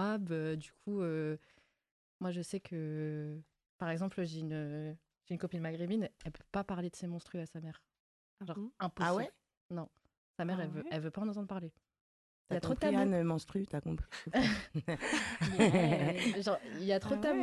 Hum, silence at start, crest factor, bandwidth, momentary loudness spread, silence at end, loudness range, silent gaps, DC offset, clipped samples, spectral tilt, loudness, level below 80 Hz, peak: none; 0 s; 22 dB; 12 kHz; 14 LU; 0 s; 9 LU; 1.91-2.20 s, 3.69-3.79 s, 8.00-8.37 s, 9.57-9.69 s, 10.17-10.34 s, 12.01-12.45 s; under 0.1%; under 0.1%; -6 dB/octave; -37 LUFS; -60 dBFS; -16 dBFS